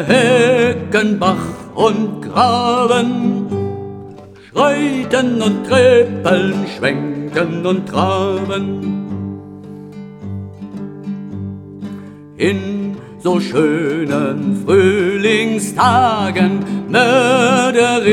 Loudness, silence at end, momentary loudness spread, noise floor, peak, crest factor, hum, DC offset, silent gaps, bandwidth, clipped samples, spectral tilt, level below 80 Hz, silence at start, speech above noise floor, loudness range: -15 LUFS; 0 s; 17 LU; -36 dBFS; 0 dBFS; 14 dB; none; under 0.1%; none; 13.5 kHz; under 0.1%; -5.5 dB/octave; -54 dBFS; 0 s; 22 dB; 11 LU